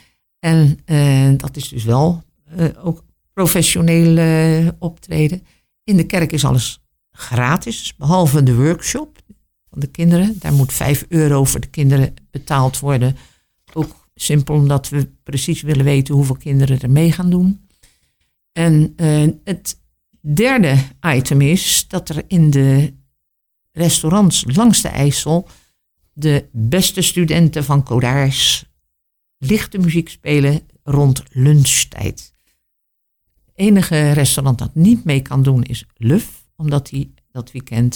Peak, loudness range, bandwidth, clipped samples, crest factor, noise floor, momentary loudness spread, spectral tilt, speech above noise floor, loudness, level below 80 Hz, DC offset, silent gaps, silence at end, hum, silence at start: -2 dBFS; 3 LU; 19 kHz; under 0.1%; 12 dB; -71 dBFS; 12 LU; -5.5 dB/octave; 57 dB; -15 LUFS; -38 dBFS; under 0.1%; none; 0 s; none; 0.45 s